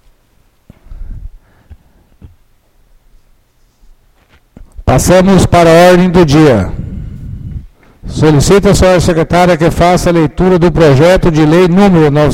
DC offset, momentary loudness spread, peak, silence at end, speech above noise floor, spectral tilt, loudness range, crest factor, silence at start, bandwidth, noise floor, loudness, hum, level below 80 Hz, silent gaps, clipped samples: under 0.1%; 19 LU; 0 dBFS; 0 s; 44 dB; -6 dB/octave; 5 LU; 10 dB; 0.9 s; 16.5 kHz; -50 dBFS; -7 LUFS; none; -24 dBFS; none; 0.4%